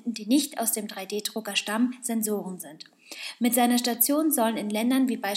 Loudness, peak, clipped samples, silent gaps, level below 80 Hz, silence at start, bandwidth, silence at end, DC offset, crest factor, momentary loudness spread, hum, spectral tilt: -25 LUFS; -8 dBFS; under 0.1%; none; -86 dBFS; 0.05 s; 17.5 kHz; 0 s; under 0.1%; 18 dB; 15 LU; none; -3 dB/octave